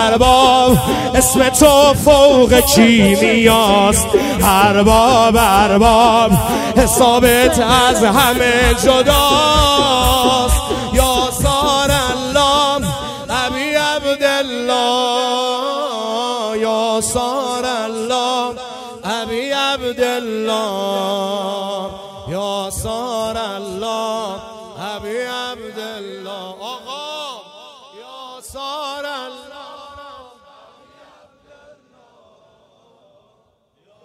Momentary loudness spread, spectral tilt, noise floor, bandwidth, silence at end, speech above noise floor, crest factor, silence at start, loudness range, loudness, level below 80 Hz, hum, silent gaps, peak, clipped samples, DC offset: 18 LU; -3.5 dB/octave; -60 dBFS; 16.5 kHz; 3.85 s; 49 dB; 14 dB; 0 s; 19 LU; -13 LUFS; -30 dBFS; none; none; 0 dBFS; under 0.1%; under 0.1%